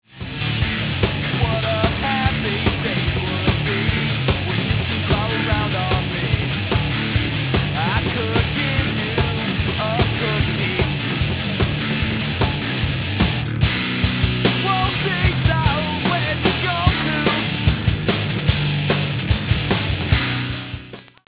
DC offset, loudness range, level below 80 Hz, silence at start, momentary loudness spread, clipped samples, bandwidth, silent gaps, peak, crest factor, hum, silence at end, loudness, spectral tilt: under 0.1%; 2 LU; -30 dBFS; 0.15 s; 3 LU; under 0.1%; 4 kHz; none; -2 dBFS; 18 dB; none; 0.25 s; -20 LUFS; -10 dB/octave